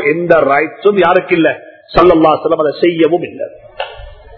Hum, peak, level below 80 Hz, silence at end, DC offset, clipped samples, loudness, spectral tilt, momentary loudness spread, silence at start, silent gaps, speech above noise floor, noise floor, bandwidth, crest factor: none; 0 dBFS; -38 dBFS; 0.25 s; under 0.1%; 0.3%; -11 LUFS; -8.5 dB/octave; 16 LU; 0 s; none; 21 dB; -32 dBFS; 6 kHz; 12 dB